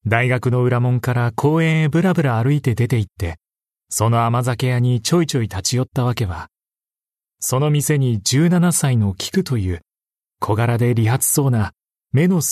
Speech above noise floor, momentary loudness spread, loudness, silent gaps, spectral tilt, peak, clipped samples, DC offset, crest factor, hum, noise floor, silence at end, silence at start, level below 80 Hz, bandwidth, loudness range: over 73 dB; 9 LU; -18 LUFS; none; -5.5 dB/octave; -2 dBFS; under 0.1%; under 0.1%; 16 dB; none; under -90 dBFS; 0 s; 0.05 s; -46 dBFS; 13.5 kHz; 2 LU